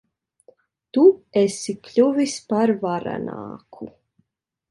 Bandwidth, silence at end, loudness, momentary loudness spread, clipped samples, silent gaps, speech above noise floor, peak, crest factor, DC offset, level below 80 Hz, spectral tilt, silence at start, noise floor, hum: 11.5 kHz; 0.8 s; -20 LUFS; 22 LU; under 0.1%; none; 57 dB; -4 dBFS; 18 dB; under 0.1%; -66 dBFS; -5.5 dB/octave; 0.95 s; -78 dBFS; none